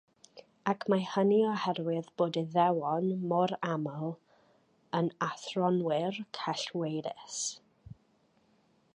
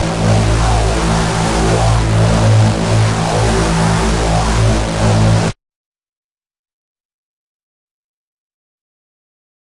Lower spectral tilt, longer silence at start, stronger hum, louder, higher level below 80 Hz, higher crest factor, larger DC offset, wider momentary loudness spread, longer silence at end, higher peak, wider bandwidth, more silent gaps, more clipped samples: about the same, -5.5 dB/octave vs -5.5 dB/octave; first, 0.35 s vs 0 s; neither; second, -32 LUFS vs -13 LUFS; second, -74 dBFS vs -22 dBFS; first, 18 dB vs 12 dB; neither; first, 9 LU vs 3 LU; second, 1 s vs 4.1 s; second, -14 dBFS vs -2 dBFS; about the same, 10.5 kHz vs 11.5 kHz; neither; neither